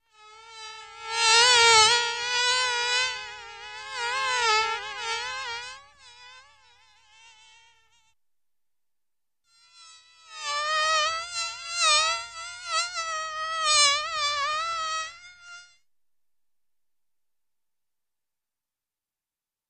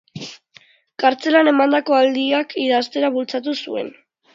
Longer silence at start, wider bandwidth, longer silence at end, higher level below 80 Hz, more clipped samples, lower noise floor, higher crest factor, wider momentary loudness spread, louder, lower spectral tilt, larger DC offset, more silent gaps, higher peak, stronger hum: about the same, 0.25 s vs 0.15 s; first, 13 kHz vs 7.6 kHz; first, 4.05 s vs 0.45 s; first, -66 dBFS vs -74 dBFS; neither; first, under -90 dBFS vs -51 dBFS; first, 24 dB vs 18 dB; first, 22 LU vs 19 LU; second, -23 LUFS vs -18 LUFS; second, 2.5 dB/octave vs -4.5 dB/octave; neither; neither; second, -4 dBFS vs 0 dBFS; neither